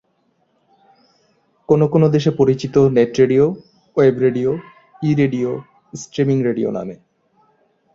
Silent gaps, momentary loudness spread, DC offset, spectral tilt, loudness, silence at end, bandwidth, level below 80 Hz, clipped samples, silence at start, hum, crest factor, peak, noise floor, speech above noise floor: none; 14 LU; under 0.1%; -7.5 dB/octave; -17 LUFS; 1 s; 7.6 kHz; -54 dBFS; under 0.1%; 1.7 s; none; 16 dB; -2 dBFS; -64 dBFS; 48 dB